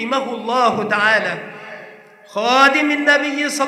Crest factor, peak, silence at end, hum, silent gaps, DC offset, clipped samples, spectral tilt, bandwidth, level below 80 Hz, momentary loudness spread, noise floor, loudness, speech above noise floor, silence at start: 18 dB; 0 dBFS; 0 s; none; none; under 0.1%; under 0.1%; -3 dB/octave; 14.5 kHz; -70 dBFS; 20 LU; -41 dBFS; -15 LUFS; 24 dB; 0 s